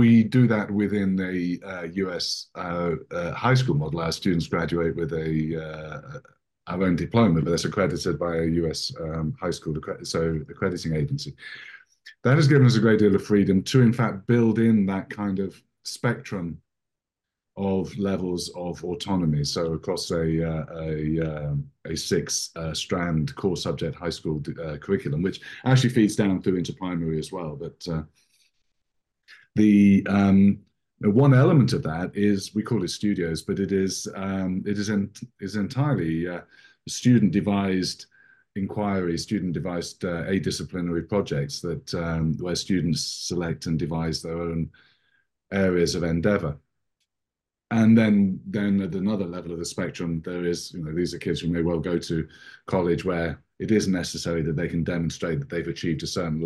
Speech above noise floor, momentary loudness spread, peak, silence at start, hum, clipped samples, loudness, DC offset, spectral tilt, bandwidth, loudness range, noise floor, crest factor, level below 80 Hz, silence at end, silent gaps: 63 dB; 13 LU; -6 dBFS; 0 s; none; under 0.1%; -25 LUFS; under 0.1%; -6 dB/octave; 12.5 kHz; 7 LU; -87 dBFS; 18 dB; -48 dBFS; 0 s; none